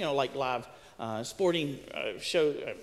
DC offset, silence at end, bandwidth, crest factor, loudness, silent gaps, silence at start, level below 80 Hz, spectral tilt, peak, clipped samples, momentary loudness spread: under 0.1%; 0 s; 15 kHz; 16 dB; -32 LUFS; none; 0 s; -64 dBFS; -4.5 dB/octave; -16 dBFS; under 0.1%; 9 LU